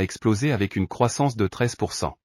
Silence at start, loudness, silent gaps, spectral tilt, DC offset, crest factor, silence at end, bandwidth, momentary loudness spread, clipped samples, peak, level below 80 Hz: 0 s; -24 LUFS; none; -5.5 dB/octave; under 0.1%; 18 dB; 0.1 s; 14.5 kHz; 4 LU; under 0.1%; -6 dBFS; -50 dBFS